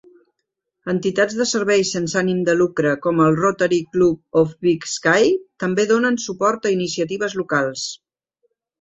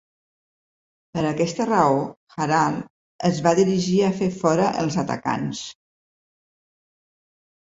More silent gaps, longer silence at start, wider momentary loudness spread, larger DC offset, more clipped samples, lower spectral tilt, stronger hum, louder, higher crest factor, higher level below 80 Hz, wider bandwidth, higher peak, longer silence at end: second, none vs 2.17-2.27 s, 2.90-3.19 s; second, 0.85 s vs 1.15 s; second, 6 LU vs 13 LU; neither; neither; second, -4.5 dB/octave vs -6 dB/octave; neither; first, -19 LUFS vs -22 LUFS; about the same, 16 dB vs 20 dB; about the same, -58 dBFS vs -60 dBFS; about the same, 8.2 kHz vs 8 kHz; about the same, -2 dBFS vs -4 dBFS; second, 0.85 s vs 1.9 s